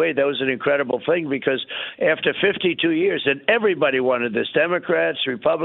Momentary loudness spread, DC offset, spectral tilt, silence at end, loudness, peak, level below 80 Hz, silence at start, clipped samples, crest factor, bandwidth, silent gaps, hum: 4 LU; under 0.1%; -9.5 dB/octave; 0 s; -20 LUFS; -4 dBFS; -64 dBFS; 0 s; under 0.1%; 18 dB; 4.2 kHz; none; none